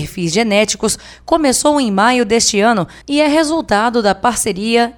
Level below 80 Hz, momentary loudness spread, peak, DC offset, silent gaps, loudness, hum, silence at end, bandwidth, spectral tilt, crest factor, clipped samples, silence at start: -42 dBFS; 6 LU; 0 dBFS; under 0.1%; none; -14 LUFS; none; 0.05 s; 18 kHz; -3.5 dB/octave; 14 dB; under 0.1%; 0 s